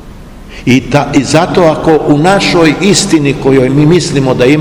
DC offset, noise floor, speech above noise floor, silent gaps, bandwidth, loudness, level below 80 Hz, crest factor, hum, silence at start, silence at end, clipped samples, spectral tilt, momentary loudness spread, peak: under 0.1%; -29 dBFS; 21 dB; none; 16 kHz; -8 LUFS; -30 dBFS; 8 dB; none; 0.05 s; 0 s; 5%; -5 dB/octave; 3 LU; 0 dBFS